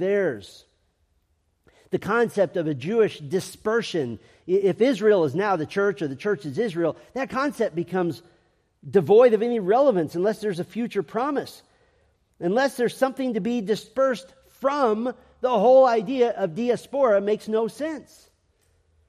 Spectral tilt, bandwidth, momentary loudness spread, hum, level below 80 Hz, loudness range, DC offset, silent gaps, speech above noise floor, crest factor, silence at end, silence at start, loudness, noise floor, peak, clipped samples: -6 dB/octave; 14.5 kHz; 11 LU; none; -66 dBFS; 5 LU; under 0.1%; none; 46 dB; 18 dB; 1.05 s; 0 s; -23 LUFS; -69 dBFS; -6 dBFS; under 0.1%